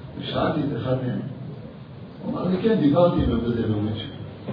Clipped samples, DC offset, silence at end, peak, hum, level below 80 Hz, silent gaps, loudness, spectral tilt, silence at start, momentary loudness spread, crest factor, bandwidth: under 0.1%; under 0.1%; 0 s; -6 dBFS; none; -42 dBFS; none; -23 LUFS; -10.5 dB/octave; 0 s; 18 LU; 18 dB; 5.2 kHz